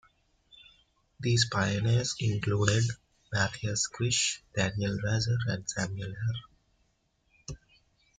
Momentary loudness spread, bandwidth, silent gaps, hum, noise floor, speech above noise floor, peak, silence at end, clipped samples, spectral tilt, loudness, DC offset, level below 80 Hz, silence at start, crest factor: 14 LU; 9.6 kHz; none; none; -73 dBFS; 44 dB; -10 dBFS; 0.6 s; under 0.1%; -4 dB/octave; -30 LUFS; under 0.1%; -56 dBFS; 1.2 s; 22 dB